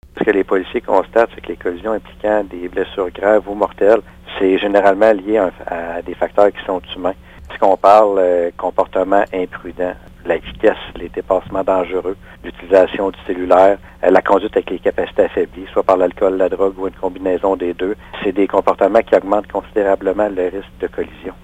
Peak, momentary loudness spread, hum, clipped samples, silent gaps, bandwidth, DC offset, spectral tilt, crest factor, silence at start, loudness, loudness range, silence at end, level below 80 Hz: 0 dBFS; 11 LU; none; under 0.1%; none; 9.2 kHz; under 0.1%; -6.5 dB/octave; 16 dB; 0.15 s; -16 LUFS; 3 LU; 0.1 s; -42 dBFS